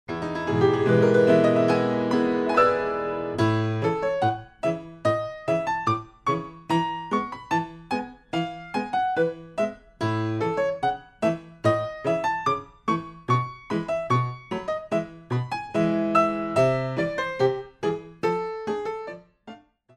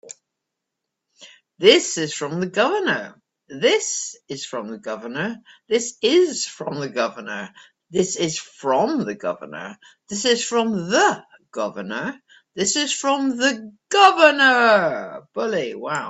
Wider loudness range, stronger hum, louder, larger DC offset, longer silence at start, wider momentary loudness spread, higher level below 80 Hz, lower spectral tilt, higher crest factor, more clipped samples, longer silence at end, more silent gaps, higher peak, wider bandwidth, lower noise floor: about the same, 6 LU vs 7 LU; neither; second, -25 LUFS vs -20 LUFS; neither; about the same, 0.1 s vs 0.05 s; second, 10 LU vs 17 LU; first, -56 dBFS vs -68 dBFS; first, -7 dB/octave vs -2.5 dB/octave; about the same, 18 dB vs 22 dB; neither; first, 0.4 s vs 0 s; neither; second, -6 dBFS vs 0 dBFS; first, 11.5 kHz vs 8.4 kHz; second, -47 dBFS vs -82 dBFS